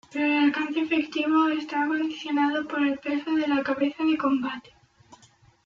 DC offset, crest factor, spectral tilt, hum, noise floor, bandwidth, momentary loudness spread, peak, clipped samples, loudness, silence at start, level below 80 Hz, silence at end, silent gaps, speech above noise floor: under 0.1%; 14 dB; -4.5 dB/octave; none; -58 dBFS; 7.2 kHz; 5 LU; -10 dBFS; under 0.1%; -25 LUFS; 0.1 s; -68 dBFS; 0.5 s; none; 33 dB